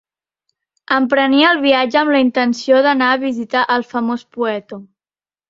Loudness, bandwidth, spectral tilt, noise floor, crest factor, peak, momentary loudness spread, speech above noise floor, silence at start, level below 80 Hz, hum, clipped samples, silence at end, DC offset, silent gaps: -15 LUFS; 7.6 kHz; -4 dB/octave; under -90 dBFS; 16 dB; 0 dBFS; 9 LU; over 75 dB; 0.9 s; -64 dBFS; none; under 0.1%; 0.65 s; under 0.1%; none